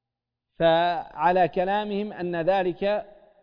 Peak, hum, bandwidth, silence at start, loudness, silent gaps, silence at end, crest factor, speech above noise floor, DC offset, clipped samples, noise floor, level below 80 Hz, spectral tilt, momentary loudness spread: -8 dBFS; none; 5.2 kHz; 0.6 s; -24 LUFS; none; 0.35 s; 18 dB; 62 dB; under 0.1%; under 0.1%; -86 dBFS; -56 dBFS; -8 dB/octave; 8 LU